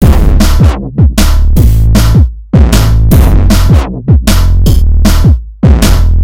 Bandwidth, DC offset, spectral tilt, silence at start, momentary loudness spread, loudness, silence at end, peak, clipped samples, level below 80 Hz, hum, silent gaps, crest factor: 17 kHz; 8%; -6 dB/octave; 0 s; 3 LU; -8 LUFS; 0 s; 0 dBFS; 6%; -8 dBFS; none; none; 6 dB